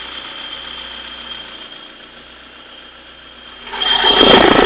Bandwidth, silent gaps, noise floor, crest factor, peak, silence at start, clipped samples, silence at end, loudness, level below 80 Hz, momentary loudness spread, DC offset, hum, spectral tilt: 4 kHz; none; -39 dBFS; 16 dB; 0 dBFS; 0 s; 0.4%; 0 s; -11 LUFS; -40 dBFS; 28 LU; under 0.1%; none; -7.5 dB/octave